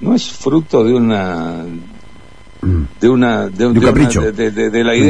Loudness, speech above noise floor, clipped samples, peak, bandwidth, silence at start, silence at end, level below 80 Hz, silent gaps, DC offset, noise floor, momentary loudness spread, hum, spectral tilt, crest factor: -14 LUFS; 27 dB; under 0.1%; 0 dBFS; 10.5 kHz; 0 s; 0 s; -30 dBFS; none; 2%; -40 dBFS; 12 LU; none; -6 dB/octave; 14 dB